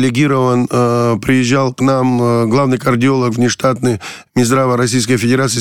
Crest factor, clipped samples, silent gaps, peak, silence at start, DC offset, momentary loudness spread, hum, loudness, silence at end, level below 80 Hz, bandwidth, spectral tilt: 10 dB; under 0.1%; none; -2 dBFS; 0 s; under 0.1%; 2 LU; none; -13 LUFS; 0 s; -46 dBFS; 14 kHz; -5.5 dB/octave